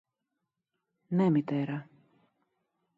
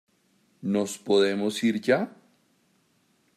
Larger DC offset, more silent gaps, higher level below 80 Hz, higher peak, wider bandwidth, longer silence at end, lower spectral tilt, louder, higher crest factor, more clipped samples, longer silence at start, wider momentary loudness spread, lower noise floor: neither; neither; about the same, -78 dBFS vs -76 dBFS; second, -18 dBFS vs -8 dBFS; second, 7.2 kHz vs 14 kHz; about the same, 1.15 s vs 1.25 s; first, -10 dB/octave vs -5 dB/octave; second, -30 LUFS vs -26 LUFS; about the same, 16 dB vs 20 dB; neither; first, 1.1 s vs 0.65 s; about the same, 10 LU vs 8 LU; first, -85 dBFS vs -67 dBFS